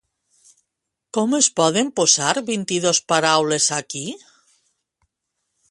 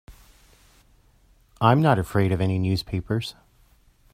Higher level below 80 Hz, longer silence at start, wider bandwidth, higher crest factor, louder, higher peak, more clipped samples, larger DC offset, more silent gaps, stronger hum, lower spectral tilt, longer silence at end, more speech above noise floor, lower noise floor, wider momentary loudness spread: second, -66 dBFS vs -50 dBFS; first, 1.15 s vs 0.1 s; second, 11.5 kHz vs 15 kHz; about the same, 20 dB vs 24 dB; first, -18 LUFS vs -23 LUFS; about the same, -2 dBFS vs -2 dBFS; neither; neither; neither; neither; second, -2 dB/octave vs -7.5 dB/octave; first, 1.55 s vs 0.85 s; first, 61 dB vs 37 dB; first, -80 dBFS vs -58 dBFS; first, 13 LU vs 10 LU